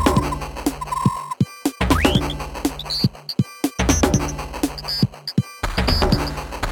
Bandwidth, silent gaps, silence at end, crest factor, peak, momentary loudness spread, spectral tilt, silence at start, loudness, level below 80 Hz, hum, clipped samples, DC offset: 17.5 kHz; none; 0 s; 18 dB; -2 dBFS; 8 LU; -5 dB/octave; 0 s; -22 LUFS; -30 dBFS; none; under 0.1%; under 0.1%